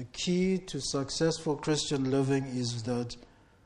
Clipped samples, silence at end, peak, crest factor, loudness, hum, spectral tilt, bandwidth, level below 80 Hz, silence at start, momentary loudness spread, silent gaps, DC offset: under 0.1%; 0.4 s; -14 dBFS; 16 dB; -31 LUFS; none; -5 dB/octave; 11.5 kHz; -56 dBFS; 0 s; 6 LU; none; under 0.1%